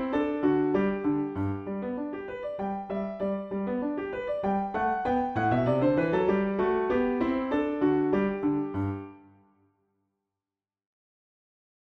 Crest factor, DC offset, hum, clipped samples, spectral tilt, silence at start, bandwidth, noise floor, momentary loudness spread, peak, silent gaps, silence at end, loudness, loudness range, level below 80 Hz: 16 dB; under 0.1%; none; under 0.1%; -9.5 dB/octave; 0 s; 6 kHz; under -90 dBFS; 9 LU; -14 dBFS; none; 2.7 s; -28 LUFS; 6 LU; -56 dBFS